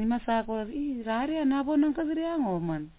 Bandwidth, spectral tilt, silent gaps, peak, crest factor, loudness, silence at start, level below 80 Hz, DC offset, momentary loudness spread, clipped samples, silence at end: 4 kHz; -5.5 dB/octave; none; -16 dBFS; 12 dB; -29 LUFS; 0 s; -54 dBFS; under 0.1%; 7 LU; under 0.1%; 0.05 s